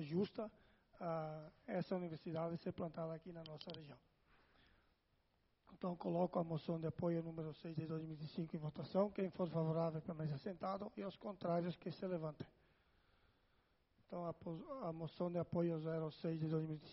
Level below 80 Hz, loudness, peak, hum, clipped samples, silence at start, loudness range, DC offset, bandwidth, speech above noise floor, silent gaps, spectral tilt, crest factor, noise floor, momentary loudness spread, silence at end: -76 dBFS; -45 LUFS; -24 dBFS; none; under 0.1%; 0 s; 7 LU; under 0.1%; 5.8 kHz; 36 dB; none; -7.5 dB/octave; 20 dB; -80 dBFS; 10 LU; 0 s